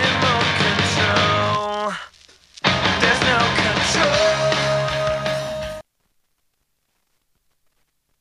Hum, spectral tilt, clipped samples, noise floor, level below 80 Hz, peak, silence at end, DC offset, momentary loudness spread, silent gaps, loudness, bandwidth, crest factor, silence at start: none; -3.5 dB/octave; under 0.1%; -70 dBFS; -44 dBFS; -2 dBFS; 2.4 s; under 0.1%; 10 LU; none; -18 LUFS; 13.5 kHz; 18 dB; 0 s